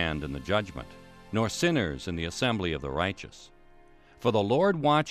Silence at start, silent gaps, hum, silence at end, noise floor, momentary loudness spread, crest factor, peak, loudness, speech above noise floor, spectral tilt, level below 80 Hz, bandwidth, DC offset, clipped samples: 0 s; none; none; 0 s; -55 dBFS; 15 LU; 18 dB; -12 dBFS; -28 LUFS; 27 dB; -5.5 dB/octave; -48 dBFS; 14 kHz; under 0.1%; under 0.1%